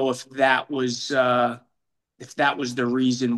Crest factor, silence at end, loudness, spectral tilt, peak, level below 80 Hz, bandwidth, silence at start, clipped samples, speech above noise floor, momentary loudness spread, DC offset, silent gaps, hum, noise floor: 18 dB; 0 s; -23 LUFS; -4.5 dB/octave; -6 dBFS; -74 dBFS; 12 kHz; 0 s; under 0.1%; 57 dB; 6 LU; under 0.1%; none; none; -79 dBFS